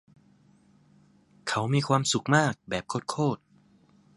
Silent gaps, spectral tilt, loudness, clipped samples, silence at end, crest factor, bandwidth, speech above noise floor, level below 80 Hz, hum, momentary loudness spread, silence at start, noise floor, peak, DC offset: none; -4.5 dB/octave; -27 LUFS; under 0.1%; 0.8 s; 24 dB; 11.5 kHz; 34 dB; -64 dBFS; 50 Hz at -50 dBFS; 10 LU; 1.45 s; -61 dBFS; -6 dBFS; under 0.1%